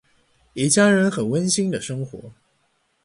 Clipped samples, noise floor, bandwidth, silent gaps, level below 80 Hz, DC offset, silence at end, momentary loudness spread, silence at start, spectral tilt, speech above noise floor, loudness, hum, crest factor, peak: under 0.1%; -67 dBFS; 11.5 kHz; none; -60 dBFS; under 0.1%; 0.75 s; 19 LU; 0.55 s; -4.5 dB/octave; 47 dB; -20 LUFS; none; 18 dB; -4 dBFS